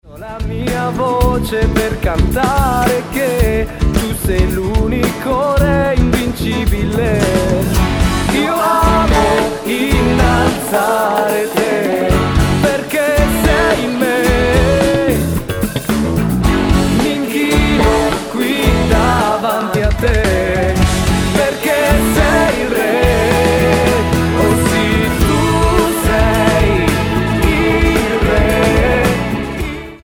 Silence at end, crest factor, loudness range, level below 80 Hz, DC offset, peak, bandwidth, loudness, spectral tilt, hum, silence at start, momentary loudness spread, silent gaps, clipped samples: 0.05 s; 12 dB; 2 LU; -20 dBFS; under 0.1%; 0 dBFS; over 20 kHz; -14 LUFS; -5.5 dB/octave; none; 0.05 s; 5 LU; none; under 0.1%